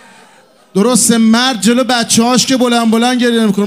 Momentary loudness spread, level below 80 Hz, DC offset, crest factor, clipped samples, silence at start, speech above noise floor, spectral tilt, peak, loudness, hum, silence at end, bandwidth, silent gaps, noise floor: 3 LU; -58 dBFS; 0.1%; 12 dB; under 0.1%; 0.75 s; 35 dB; -3.5 dB/octave; 0 dBFS; -10 LUFS; none; 0 s; 16 kHz; none; -45 dBFS